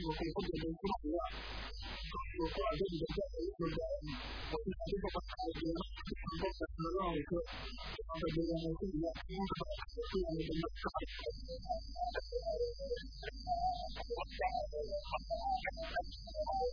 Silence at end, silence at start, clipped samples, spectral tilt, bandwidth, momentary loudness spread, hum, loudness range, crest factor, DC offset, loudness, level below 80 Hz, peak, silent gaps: 0 s; 0 s; under 0.1%; -4.5 dB/octave; 5.4 kHz; 7 LU; none; 1 LU; 14 dB; under 0.1%; -41 LUFS; -48 dBFS; -26 dBFS; none